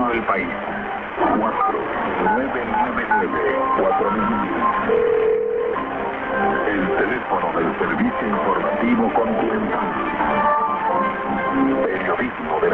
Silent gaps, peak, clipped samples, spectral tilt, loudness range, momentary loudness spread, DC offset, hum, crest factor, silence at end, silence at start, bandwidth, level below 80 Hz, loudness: none; -6 dBFS; under 0.1%; -8.5 dB/octave; 1 LU; 4 LU; under 0.1%; none; 14 dB; 0 s; 0 s; 4.7 kHz; -46 dBFS; -20 LUFS